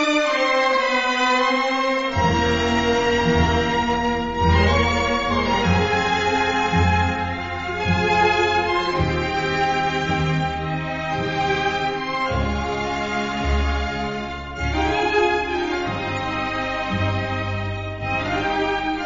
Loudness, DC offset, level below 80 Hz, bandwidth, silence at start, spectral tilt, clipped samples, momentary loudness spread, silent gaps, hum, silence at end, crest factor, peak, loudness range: -21 LUFS; 0.2%; -34 dBFS; 7.8 kHz; 0 s; -3.5 dB/octave; under 0.1%; 7 LU; none; none; 0 s; 16 dB; -6 dBFS; 4 LU